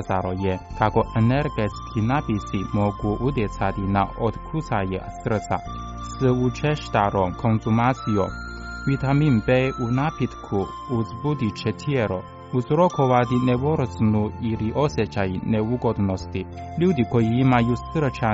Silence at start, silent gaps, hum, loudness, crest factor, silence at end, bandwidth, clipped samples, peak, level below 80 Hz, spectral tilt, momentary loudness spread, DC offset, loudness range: 0 s; none; none; -23 LUFS; 18 dB; 0 s; 7.8 kHz; under 0.1%; -6 dBFS; -40 dBFS; -7 dB/octave; 9 LU; under 0.1%; 3 LU